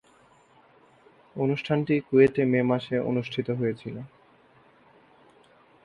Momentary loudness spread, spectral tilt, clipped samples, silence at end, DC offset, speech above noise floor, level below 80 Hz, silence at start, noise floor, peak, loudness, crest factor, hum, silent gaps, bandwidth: 18 LU; -8.5 dB/octave; under 0.1%; 1.8 s; under 0.1%; 34 dB; -64 dBFS; 1.35 s; -59 dBFS; -6 dBFS; -25 LUFS; 22 dB; none; none; 7 kHz